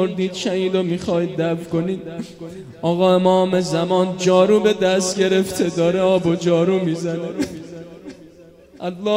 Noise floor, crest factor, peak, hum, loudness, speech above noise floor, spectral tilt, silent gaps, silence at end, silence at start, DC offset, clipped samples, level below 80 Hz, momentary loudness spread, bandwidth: -45 dBFS; 16 dB; -2 dBFS; none; -19 LUFS; 27 dB; -5.5 dB/octave; none; 0 s; 0 s; under 0.1%; under 0.1%; -54 dBFS; 18 LU; 16 kHz